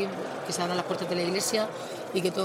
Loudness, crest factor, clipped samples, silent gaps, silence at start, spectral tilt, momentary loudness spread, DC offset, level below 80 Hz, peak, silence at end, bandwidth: -29 LUFS; 18 dB; under 0.1%; none; 0 s; -3.5 dB/octave; 7 LU; under 0.1%; -72 dBFS; -12 dBFS; 0 s; 16 kHz